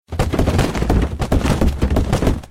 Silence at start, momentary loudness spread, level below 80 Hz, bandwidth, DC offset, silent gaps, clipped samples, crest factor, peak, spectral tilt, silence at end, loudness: 0.1 s; 2 LU; -20 dBFS; 16 kHz; under 0.1%; none; under 0.1%; 14 dB; -4 dBFS; -6.5 dB/octave; 0.05 s; -18 LUFS